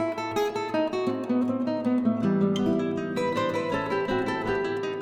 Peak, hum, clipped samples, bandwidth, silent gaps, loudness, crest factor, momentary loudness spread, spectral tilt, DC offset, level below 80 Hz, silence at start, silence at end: -12 dBFS; none; under 0.1%; 15 kHz; none; -27 LUFS; 14 dB; 4 LU; -6.5 dB/octave; under 0.1%; -56 dBFS; 0 s; 0 s